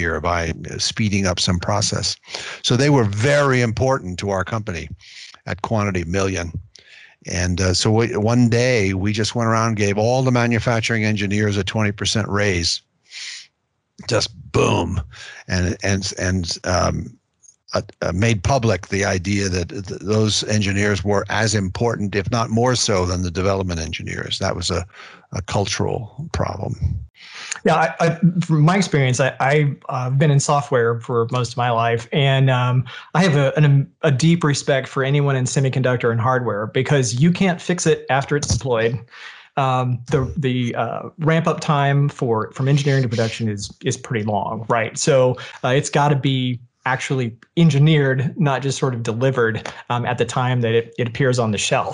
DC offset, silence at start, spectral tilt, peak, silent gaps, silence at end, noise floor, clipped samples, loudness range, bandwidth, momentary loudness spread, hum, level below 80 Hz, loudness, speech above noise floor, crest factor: under 0.1%; 0 s; -5 dB/octave; -6 dBFS; 27.10-27.14 s; 0 s; -71 dBFS; under 0.1%; 5 LU; 11 kHz; 10 LU; none; -42 dBFS; -19 LUFS; 52 dB; 14 dB